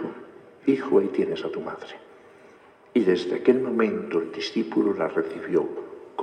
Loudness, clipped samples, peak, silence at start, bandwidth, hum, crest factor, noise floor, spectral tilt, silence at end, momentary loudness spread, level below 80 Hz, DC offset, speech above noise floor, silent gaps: -25 LUFS; under 0.1%; -6 dBFS; 0 s; 9.2 kHz; none; 20 dB; -52 dBFS; -6.5 dB/octave; 0 s; 15 LU; -76 dBFS; under 0.1%; 28 dB; none